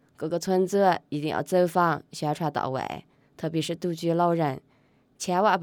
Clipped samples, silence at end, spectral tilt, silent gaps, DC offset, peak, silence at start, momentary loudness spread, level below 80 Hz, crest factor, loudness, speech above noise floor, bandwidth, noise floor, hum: under 0.1%; 0 s; -5.5 dB/octave; none; under 0.1%; -10 dBFS; 0.2 s; 10 LU; -68 dBFS; 16 dB; -26 LUFS; 38 dB; 19 kHz; -63 dBFS; none